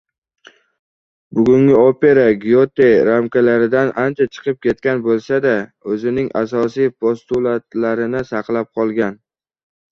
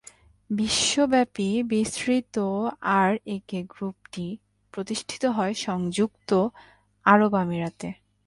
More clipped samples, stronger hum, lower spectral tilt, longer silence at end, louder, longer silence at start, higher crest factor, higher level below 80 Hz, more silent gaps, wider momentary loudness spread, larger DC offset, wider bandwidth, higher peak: neither; neither; first, -8 dB/octave vs -4.5 dB/octave; first, 0.8 s vs 0.35 s; first, -16 LUFS vs -25 LUFS; first, 1.3 s vs 0.5 s; second, 14 dB vs 22 dB; first, -54 dBFS vs -60 dBFS; neither; second, 9 LU vs 15 LU; neither; second, 6.8 kHz vs 11.5 kHz; first, 0 dBFS vs -4 dBFS